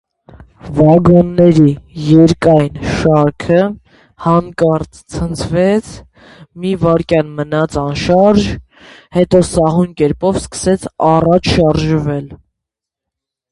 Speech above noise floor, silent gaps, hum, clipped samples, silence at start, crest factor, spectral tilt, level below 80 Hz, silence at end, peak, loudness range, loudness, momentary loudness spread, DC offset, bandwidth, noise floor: 69 dB; none; none; under 0.1%; 0.4 s; 12 dB; -7 dB/octave; -34 dBFS; 1.15 s; 0 dBFS; 5 LU; -12 LUFS; 11 LU; under 0.1%; 11.5 kHz; -81 dBFS